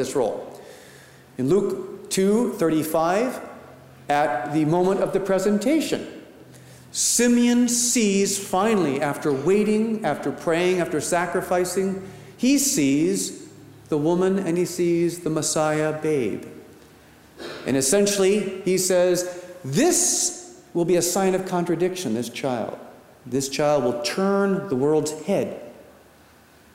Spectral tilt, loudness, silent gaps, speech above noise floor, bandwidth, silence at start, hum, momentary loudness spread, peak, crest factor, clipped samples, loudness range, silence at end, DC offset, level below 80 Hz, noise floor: -4 dB/octave; -22 LUFS; none; 31 dB; 16 kHz; 0 s; none; 12 LU; -8 dBFS; 14 dB; under 0.1%; 3 LU; 0.95 s; under 0.1%; -58 dBFS; -52 dBFS